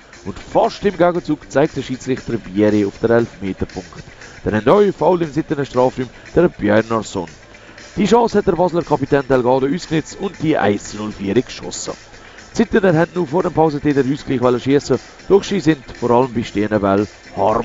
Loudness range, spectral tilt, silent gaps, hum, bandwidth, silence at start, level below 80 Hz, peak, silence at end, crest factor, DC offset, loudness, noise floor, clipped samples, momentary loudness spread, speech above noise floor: 3 LU; -6.5 dB/octave; none; none; 8 kHz; 0.15 s; -42 dBFS; 0 dBFS; 0 s; 16 dB; under 0.1%; -17 LUFS; -39 dBFS; under 0.1%; 12 LU; 23 dB